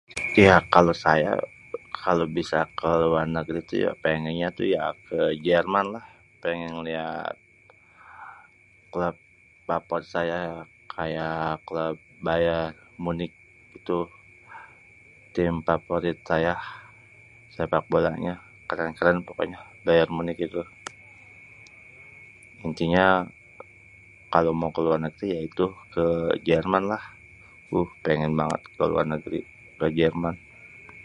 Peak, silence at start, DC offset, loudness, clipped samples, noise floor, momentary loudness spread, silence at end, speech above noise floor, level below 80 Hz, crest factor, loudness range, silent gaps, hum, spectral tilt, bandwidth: 0 dBFS; 0.1 s; under 0.1%; -25 LUFS; under 0.1%; -56 dBFS; 19 LU; 0 s; 32 dB; -50 dBFS; 26 dB; 6 LU; none; none; -6.5 dB/octave; 11 kHz